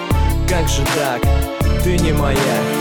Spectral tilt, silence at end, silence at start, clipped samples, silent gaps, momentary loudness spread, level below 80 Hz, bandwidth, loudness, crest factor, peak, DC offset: -5 dB/octave; 0 s; 0 s; under 0.1%; none; 2 LU; -20 dBFS; over 20 kHz; -17 LUFS; 12 dB; -4 dBFS; 2%